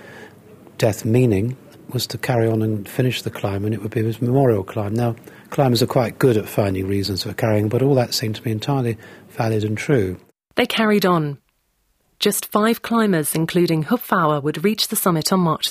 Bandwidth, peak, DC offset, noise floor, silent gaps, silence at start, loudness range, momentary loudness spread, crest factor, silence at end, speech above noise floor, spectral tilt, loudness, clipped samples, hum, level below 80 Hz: 16 kHz; -2 dBFS; under 0.1%; -66 dBFS; none; 0 s; 2 LU; 8 LU; 18 dB; 0 s; 47 dB; -5.5 dB/octave; -20 LUFS; under 0.1%; none; -56 dBFS